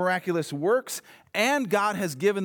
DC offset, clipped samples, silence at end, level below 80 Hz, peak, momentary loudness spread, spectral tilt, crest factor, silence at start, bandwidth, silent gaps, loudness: under 0.1%; under 0.1%; 0 s; -78 dBFS; -10 dBFS; 9 LU; -4.5 dB/octave; 16 dB; 0 s; 20 kHz; none; -26 LUFS